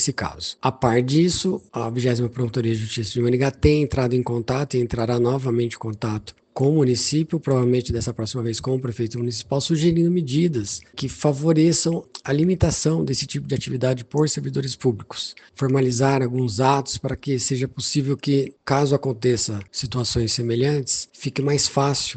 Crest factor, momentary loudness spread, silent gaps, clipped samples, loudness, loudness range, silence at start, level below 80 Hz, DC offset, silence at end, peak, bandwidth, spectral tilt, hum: 20 dB; 8 LU; none; under 0.1%; -22 LUFS; 2 LU; 0 s; -44 dBFS; under 0.1%; 0 s; -2 dBFS; 9.2 kHz; -5.5 dB/octave; none